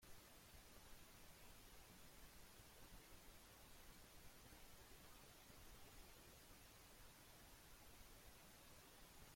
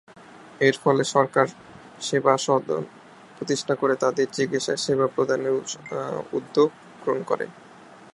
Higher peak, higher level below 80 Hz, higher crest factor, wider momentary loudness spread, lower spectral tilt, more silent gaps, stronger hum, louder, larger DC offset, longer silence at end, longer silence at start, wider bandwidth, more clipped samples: second, -50 dBFS vs -2 dBFS; about the same, -70 dBFS vs -70 dBFS; second, 14 dB vs 22 dB; second, 1 LU vs 10 LU; second, -3 dB/octave vs -4.5 dB/octave; neither; neither; second, -65 LUFS vs -24 LUFS; neither; second, 0 s vs 0.2 s; second, 0 s vs 0.35 s; first, 16.5 kHz vs 11.5 kHz; neither